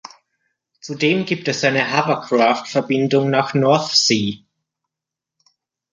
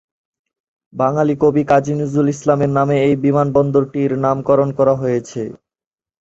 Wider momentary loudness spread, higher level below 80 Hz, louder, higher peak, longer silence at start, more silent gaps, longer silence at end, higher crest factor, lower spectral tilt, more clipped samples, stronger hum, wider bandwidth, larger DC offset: about the same, 8 LU vs 6 LU; second, -62 dBFS vs -52 dBFS; about the same, -17 LUFS vs -16 LUFS; about the same, -2 dBFS vs -2 dBFS; second, 0.05 s vs 0.95 s; neither; first, 1.55 s vs 0.65 s; about the same, 18 dB vs 16 dB; second, -4 dB/octave vs -8 dB/octave; neither; neither; first, 9.6 kHz vs 8 kHz; neither